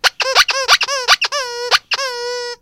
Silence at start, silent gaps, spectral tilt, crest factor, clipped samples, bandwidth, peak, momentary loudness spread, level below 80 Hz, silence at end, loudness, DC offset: 0.05 s; none; 2.5 dB/octave; 16 dB; under 0.1%; over 20 kHz; 0 dBFS; 9 LU; -52 dBFS; 0.05 s; -14 LUFS; under 0.1%